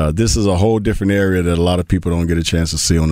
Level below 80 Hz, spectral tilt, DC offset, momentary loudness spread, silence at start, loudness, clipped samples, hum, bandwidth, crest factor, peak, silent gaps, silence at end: -26 dBFS; -5.5 dB/octave; under 0.1%; 3 LU; 0 s; -16 LUFS; under 0.1%; none; 16 kHz; 12 dB; -2 dBFS; none; 0 s